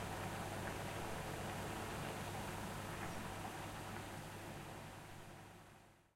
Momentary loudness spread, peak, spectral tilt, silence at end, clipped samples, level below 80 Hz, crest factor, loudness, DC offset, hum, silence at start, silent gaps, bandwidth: 11 LU; -30 dBFS; -4.5 dB/octave; 0.1 s; under 0.1%; -60 dBFS; 18 dB; -47 LUFS; under 0.1%; none; 0 s; none; 16 kHz